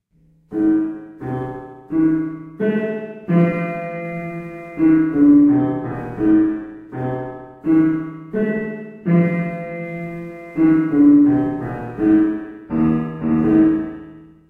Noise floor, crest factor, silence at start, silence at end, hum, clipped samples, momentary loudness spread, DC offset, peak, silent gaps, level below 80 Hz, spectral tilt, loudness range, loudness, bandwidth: -56 dBFS; 14 dB; 0.5 s; 0.25 s; none; under 0.1%; 16 LU; under 0.1%; -4 dBFS; none; -48 dBFS; -11 dB/octave; 5 LU; -18 LUFS; 3.3 kHz